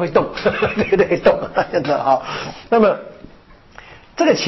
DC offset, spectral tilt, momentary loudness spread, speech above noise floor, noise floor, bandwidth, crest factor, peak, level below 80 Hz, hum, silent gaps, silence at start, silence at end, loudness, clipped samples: under 0.1%; -5.5 dB/octave; 12 LU; 28 dB; -45 dBFS; 6.2 kHz; 14 dB; -4 dBFS; -44 dBFS; none; none; 0 s; 0 s; -17 LUFS; under 0.1%